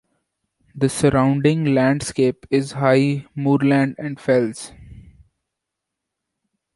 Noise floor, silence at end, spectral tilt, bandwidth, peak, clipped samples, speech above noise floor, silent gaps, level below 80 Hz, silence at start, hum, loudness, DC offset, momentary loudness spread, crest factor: -82 dBFS; 1.75 s; -6.5 dB/octave; 11.5 kHz; -2 dBFS; under 0.1%; 64 dB; none; -50 dBFS; 0.75 s; none; -19 LUFS; under 0.1%; 7 LU; 18 dB